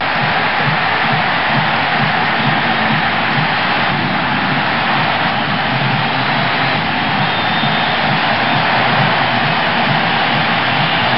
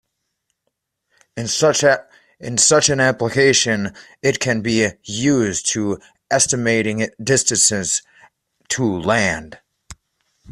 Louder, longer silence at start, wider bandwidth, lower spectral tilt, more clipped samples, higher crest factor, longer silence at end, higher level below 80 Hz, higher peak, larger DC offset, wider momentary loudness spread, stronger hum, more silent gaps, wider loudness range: first, -14 LUFS vs -17 LUFS; second, 0 s vs 1.35 s; second, 5.8 kHz vs 14.5 kHz; first, -10.5 dB/octave vs -3 dB/octave; neither; second, 12 dB vs 18 dB; about the same, 0 s vs 0 s; about the same, -48 dBFS vs -52 dBFS; about the same, -2 dBFS vs 0 dBFS; first, 2% vs under 0.1%; second, 2 LU vs 10 LU; neither; neither; about the same, 1 LU vs 3 LU